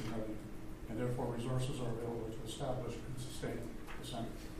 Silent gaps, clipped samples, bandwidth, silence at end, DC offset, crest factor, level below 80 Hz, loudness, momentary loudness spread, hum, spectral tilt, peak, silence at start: none; under 0.1%; 15.5 kHz; 0 s; under 0.1%; 16 dB; -52 dBFS; -42 LUFS; 9 LU; none; -6 dB/octave; -24 dBFS; 0 s